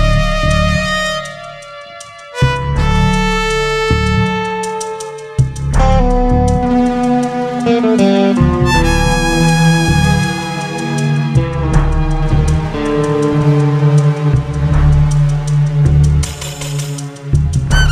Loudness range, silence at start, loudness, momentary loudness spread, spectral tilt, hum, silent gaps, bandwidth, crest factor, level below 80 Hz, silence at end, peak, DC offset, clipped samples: 3 LU; 0 s; -14 LUFS; 9 LU; -6 dB/octave; none; none; 13 kHz; 12 dB; -20 dBFS; 0 s; 0 dBFS; under 0.1%; under 0.1%